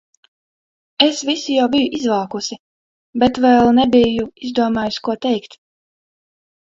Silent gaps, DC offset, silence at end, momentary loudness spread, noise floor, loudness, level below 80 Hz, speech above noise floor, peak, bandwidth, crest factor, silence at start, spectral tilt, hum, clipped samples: 2.59-3.13 s; under 0.1%; 1.3 s; 13 LU; under -90 dBFS; -16 LUFS; -50 dBFS; over 74 dB; 0 dBFS; 7.8 kHz; 18 dB; 1 s; -4 dB/octave; none; under 0.1%